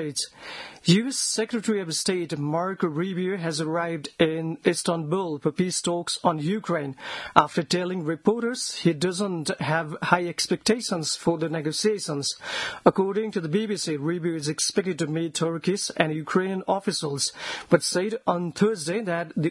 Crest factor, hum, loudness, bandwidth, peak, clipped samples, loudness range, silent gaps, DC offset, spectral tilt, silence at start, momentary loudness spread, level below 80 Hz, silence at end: 26 dB; none; -25 LUFS; 12 kHz; 0 dBFS; under 0.1%; 1 LU; none; under 0.1%; -4.5 dB/octave; 0 s; 6 LU; -64 dBFS; 0 s